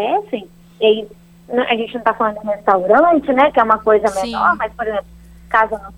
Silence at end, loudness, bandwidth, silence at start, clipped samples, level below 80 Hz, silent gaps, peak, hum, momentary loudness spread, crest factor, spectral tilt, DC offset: 0.05 s; -16 LUFS; 12.5 kHz; 0 s; under 0.1%; -46 dBFS; none; 0 dBFS; none; 10 LU; 16 dB; -5 dB/octave; under 0.1%